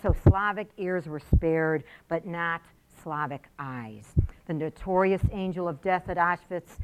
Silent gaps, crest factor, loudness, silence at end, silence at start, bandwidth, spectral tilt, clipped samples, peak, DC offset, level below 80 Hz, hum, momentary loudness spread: none; 22 dB; -28 LUFS; 0 s; 0.05 s; 14 kHz; -8.5 dB/octave; under 0.1%; -6 dBFS; under 0.1%; -34 dBFS; none; 13 LU